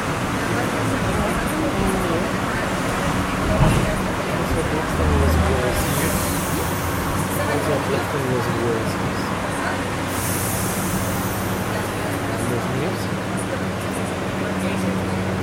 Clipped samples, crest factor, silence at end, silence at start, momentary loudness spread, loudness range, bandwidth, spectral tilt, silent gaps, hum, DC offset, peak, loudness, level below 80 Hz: under 0.1%; 18 dB; 0 s; 0 s; 5 LU; 3 LU; 16.5 kHz; -5 dB/octave; none; none; under 0.1%; -2 dBFS; -22 LUFS; -32 dBFS